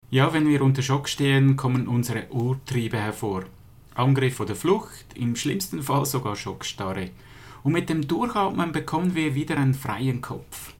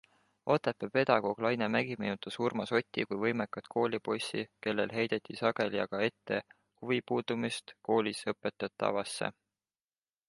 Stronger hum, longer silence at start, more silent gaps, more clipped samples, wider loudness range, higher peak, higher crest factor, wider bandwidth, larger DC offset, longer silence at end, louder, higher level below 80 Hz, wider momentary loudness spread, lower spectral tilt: neither; second, 0.1 s vs 0.45 s; neither; neither; about the same, 4 LU vs 3 LU; about the same, -8 dBFS vs -10 dBFS; about the same, 18 dB vs 22 dB; first, 17 kHz vs 11.5 kHz; first, 0.1% vs under 0.1%; second, 0.1 s vs 0.95 s; first, -24 LUFS vs -33 LUFS; first, -52 dBFS vs -74 dBFS; first, 10 LU vs 7 LU; about the same, -6 dB/octave vs -5 dB/octave